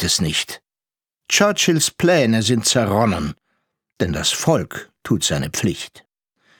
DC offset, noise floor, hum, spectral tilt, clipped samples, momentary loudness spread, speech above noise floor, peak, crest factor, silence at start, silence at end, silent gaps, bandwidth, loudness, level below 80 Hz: under 0.1%; under -90 dBFS; none; -3.5 dB/octave; under 0.1%; 14 LU; over 72 dB; -2 dBFS; 18 dB; 0 s; 0.6 s; none; over 20 kHz; -18 LUFS; -44 dBFS